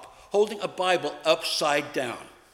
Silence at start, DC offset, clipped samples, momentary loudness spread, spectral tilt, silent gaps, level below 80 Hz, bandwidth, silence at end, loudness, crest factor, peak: 0 s; under 0.1%; under 0.1%; 8 LU; -2.5 dB/octave; none; -68 dBFS; 16.5 kHz; 0.25 s; -26 LUFS; 20 dB; -6 dBFS